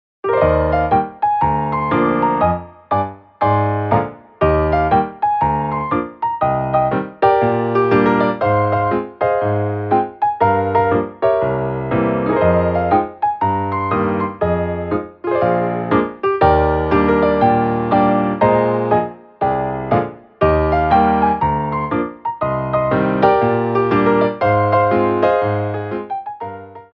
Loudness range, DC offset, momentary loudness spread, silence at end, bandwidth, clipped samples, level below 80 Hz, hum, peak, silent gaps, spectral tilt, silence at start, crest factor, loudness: 2 LU; under 0.1%; 7 LU; 0.1 s; 5.6 kHz; under 0.1%; -36 dBFS; none; 0 dBFS; none; -10 dB/octave; 0.25 s; 16 dB; -17 LUFS